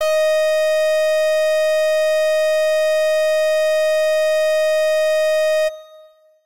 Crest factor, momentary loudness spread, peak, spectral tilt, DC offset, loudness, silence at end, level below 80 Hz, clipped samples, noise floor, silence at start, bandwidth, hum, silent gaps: 4 dB; 0 LU; -12 dBFS; 2 dB/octave; 2%; -17 LUFS; 0 s; -70 dBFS; under 0.1%; -48 dBFS; 0 s; 16 kHz; none; none